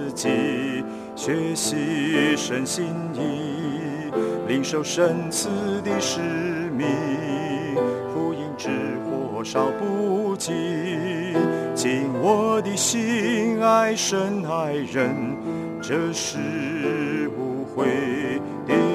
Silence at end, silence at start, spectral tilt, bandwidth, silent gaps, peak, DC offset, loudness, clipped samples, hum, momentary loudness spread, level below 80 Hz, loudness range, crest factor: 0 s; 0 s; -4.5 dB/octave; 14 kHz; none; -6 dBFS; under 0.1%; -24 LUFS; under 0.1%; none; 7 LU; -64 dBFS; 4 LU; 18 dB